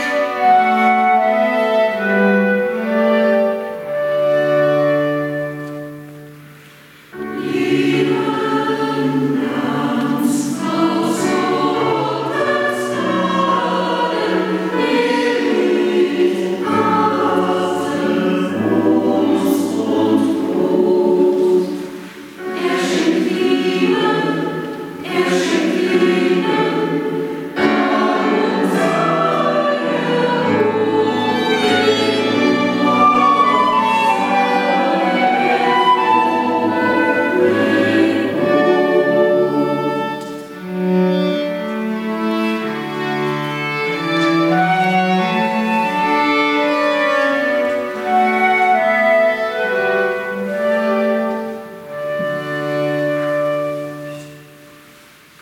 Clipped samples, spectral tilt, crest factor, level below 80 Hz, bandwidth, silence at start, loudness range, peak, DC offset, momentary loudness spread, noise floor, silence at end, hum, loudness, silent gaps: under 0.1%; -5.5 dB/octave; 14 dB; -62 dBFS; 16.5 kHz; 0 s; 5 LU; -2 dBFS; under 0.1%; 8 LU; -44 dBFS; 0.75 s; none; -16 LUFS; none